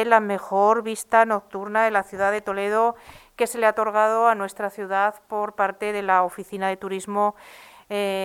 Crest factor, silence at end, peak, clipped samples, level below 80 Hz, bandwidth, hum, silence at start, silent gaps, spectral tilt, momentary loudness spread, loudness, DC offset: 20 dB; 0 s; -2 dBFS; under 0.1%; -64 dBFS; 16.5 kHz; none; 0 s; none; -4 dB/octave; 9 LU; -23 LUFS; under 0.1%